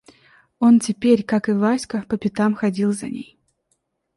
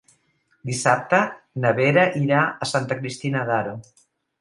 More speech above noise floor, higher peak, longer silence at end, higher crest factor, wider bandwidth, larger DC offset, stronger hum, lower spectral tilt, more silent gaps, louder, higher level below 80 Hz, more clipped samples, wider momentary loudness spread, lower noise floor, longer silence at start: first, 52 dB vs 45 dB; about the same, -4 dBFS vs -2 dBFS; first, 0.95 s vs 0.6 s; about the same, 16 dB vs 20 dB; about the same, 11.5 kHz vs 11.5 kHz; neither; neither; about the same, -6 dB/octave vs -5 dB/octave; neither; about the same, -19 LUFS vs -21 LUFS; about the same, -60 dBFS vs -64 dBFS; neither; about the same, 10 LU vs 11 LU; first, -71 dBFS vs -66 dBFS; about the same, 0.6 s vs 0.65 s